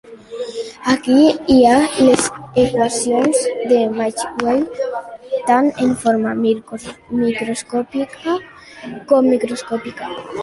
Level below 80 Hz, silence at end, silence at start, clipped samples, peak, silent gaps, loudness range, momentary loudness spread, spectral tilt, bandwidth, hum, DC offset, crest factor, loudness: -50 dBFS; 0 s; 0.05 s; under 0.1%; -2 dBFS; none; 6 LU; 15 LU; -4 dB/octave; 11.5 kHz; none; under 0.1%; 16 dB; -16 LUFS